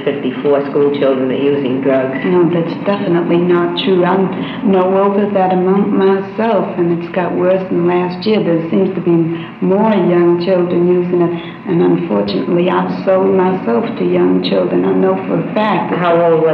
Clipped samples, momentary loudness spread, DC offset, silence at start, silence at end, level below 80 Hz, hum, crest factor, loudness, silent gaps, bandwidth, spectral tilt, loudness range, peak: under 0.1%; 4 LU; under 0.1%; 0 s; 0 s; -56 dBFS; none; 10 dB; -13 LUFS; none; 5.4 kHz; -10 dB/octave; 1 LU; -2 dBFS